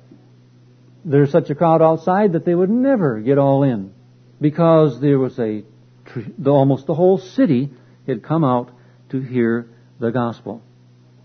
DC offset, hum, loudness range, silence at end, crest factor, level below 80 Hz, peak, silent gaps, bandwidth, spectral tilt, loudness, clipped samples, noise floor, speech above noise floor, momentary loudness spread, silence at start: under 0.1%; none; 5 LU; 0.65 s; 16 dB; -62 dBFS; -2 dBFS; none; 6.4 kHz; -10 dB/octave; -17 LUFS; under 0.1%; -49 dBFS; 33 dB; 17 LU; 1.05 s